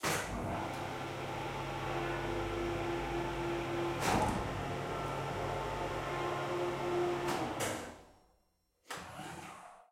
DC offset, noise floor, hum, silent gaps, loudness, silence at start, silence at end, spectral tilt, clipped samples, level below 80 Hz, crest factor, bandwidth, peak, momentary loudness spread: under 0.1%; -76 dBFS; none; none; -37 LUFS; 0 s; 0.1 s; -5 dB/octave; under 0.1%; -52 dBFS; 18 dB; 16.5 kHz; -18 dBFS; 12 LU